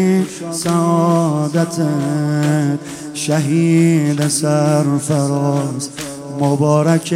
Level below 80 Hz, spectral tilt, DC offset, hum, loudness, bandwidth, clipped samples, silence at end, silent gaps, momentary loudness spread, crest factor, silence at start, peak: -58 dBFS; -6 dB/octave; under 0.1%; none; -16 LUFS; 15.5 kHz; under 0.1%; 0 s; none; 9 LU; 14 dB; 0 s; 0 dBFS